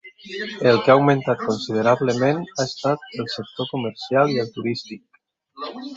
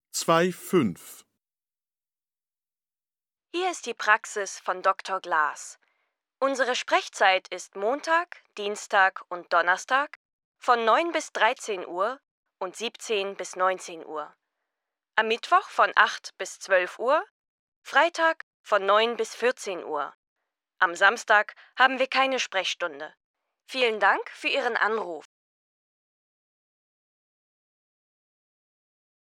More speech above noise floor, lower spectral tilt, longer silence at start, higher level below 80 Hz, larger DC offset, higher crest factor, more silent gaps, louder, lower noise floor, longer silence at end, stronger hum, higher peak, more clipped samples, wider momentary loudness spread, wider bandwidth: second, 32 dB vs over 64 dB; first, -6 dB/octave vs -2.5 dB/octave; about the same, 0.05 s vs 0.15 s; first, -62 dBFS vs -84 dBFS; neither; about the same, 20 dB vs 24 dB; second, none vs 10.16-10.39 s, 10.45-10.54 s, 12.31-12.43 s, 17.30-17.82 s, 18.43-18.64 s, 20.15-20.36 s, 23.24-23.34 s; first, -21 LUFS vs -25 LUFS; second, -53 dBFS vs under -90 dBFS; second, 0 s vs 4 s; neither; about the same, -2 dBFS vs -4 dBFS; neither; about the same, 17 LU vs 15 LU; second, 7.8 kHz vs 17.5 kHz